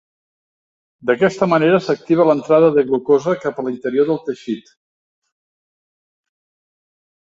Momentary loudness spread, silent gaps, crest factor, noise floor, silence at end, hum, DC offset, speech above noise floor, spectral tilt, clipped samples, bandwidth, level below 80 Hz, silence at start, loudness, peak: 12 LU; none; 18 dB; under -90 dBFS; 2.7 s; none; under 0.1%; over 74 dB; -7 dB/octave; under 0.1%; 7.8 kHz; -62 dBFS; 1.05 s; -16 LUFS; -2 dBFS